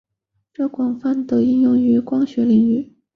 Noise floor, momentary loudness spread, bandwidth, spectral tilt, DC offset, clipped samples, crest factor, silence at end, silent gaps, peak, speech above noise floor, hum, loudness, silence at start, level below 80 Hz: -72 dBFS; 8 LU; 5 kHz; -9.5 dB/octave; under 0.1%; under 0.1%; 12 dB; 0.3 s; none; -6 dBFS; 55 dB; none; -18 LUFS; 0.6 s; -60 dBFS